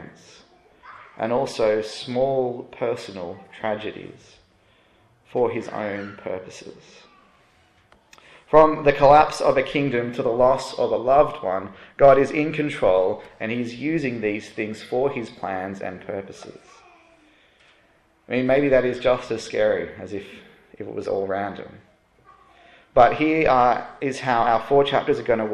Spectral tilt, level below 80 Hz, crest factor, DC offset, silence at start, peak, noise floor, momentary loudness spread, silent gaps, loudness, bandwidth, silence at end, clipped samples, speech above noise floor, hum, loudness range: -6 dB/octave; -50 dBFS; 22 dB; under 0.1%; 0 s; -2 dBFS; -60 dBFS; 18 LU; none; -21 LUFS; 11.5 kHz; 0 s; under 0.1%; 38 dB; none; 12 LU